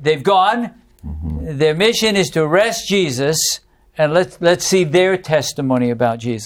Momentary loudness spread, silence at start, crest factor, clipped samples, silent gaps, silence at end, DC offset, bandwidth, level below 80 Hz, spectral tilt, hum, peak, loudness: 12 LU; 0 s; 14 dB; under 0.1%; none; 0 s; under 0.1%; 18 kHz; -40 dBFS; -4 dB/octave; none; -2 dBFS; -16 LUFS